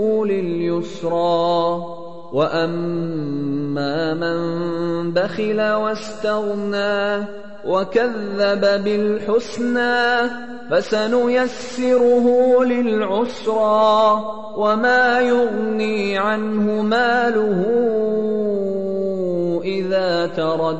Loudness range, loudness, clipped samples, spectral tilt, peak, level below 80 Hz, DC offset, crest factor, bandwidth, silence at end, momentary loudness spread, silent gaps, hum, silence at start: 5 LU; -19 LUFS; under 0.1%; -6 dB/octave; -4 dBFS; -58 dBFS; 2%; 14 dB; 8.4 kHz; 0 s; 8 LU; none; none; 0 s